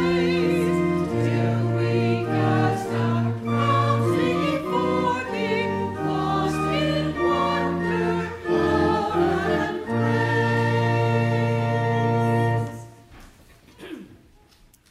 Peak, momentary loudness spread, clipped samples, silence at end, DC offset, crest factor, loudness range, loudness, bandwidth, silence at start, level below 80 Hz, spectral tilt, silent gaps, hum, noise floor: -8 dBFS; 4 LU; under 0.1%; 0.75 s; under 0.1%; 14 dB; 2 LU; -23 LUFS; 13 kHz; 0 s; -50 dBFS; -7 dB/octave; none; none; -55 dBFS